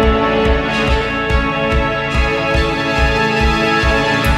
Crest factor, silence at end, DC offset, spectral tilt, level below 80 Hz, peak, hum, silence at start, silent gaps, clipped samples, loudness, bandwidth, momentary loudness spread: 12 dB; 0 s; under 0.1%; -5.5 dB/octave; -20 dBFS; -2 dBFS; none; 0 s; none; under 0.1%; -15 LUFS; 14 kHz; 3 LU